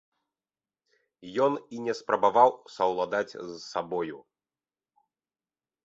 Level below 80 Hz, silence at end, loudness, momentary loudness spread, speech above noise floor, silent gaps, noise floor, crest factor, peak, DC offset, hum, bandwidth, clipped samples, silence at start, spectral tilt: -74 dBFS; 1.65 s; -28 LUFS; 14 LU; over 63 dB; none; under -90 dBFS; 24 dB; -6 dBFS; under 0.1%; none; 7.8 kHz; under 0.1%; 1.2 s; -5 dB/octave